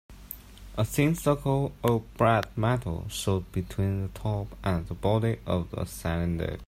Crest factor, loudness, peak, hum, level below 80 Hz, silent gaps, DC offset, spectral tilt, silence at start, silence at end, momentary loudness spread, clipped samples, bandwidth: 18 dB; -28 LUFS; -10 dBFS; none; -44 dBFS; none; under 0.1%; -6.5 dB/octave; 0.1 s; 0 s; 9 LU; under 0.1%; 16 kHz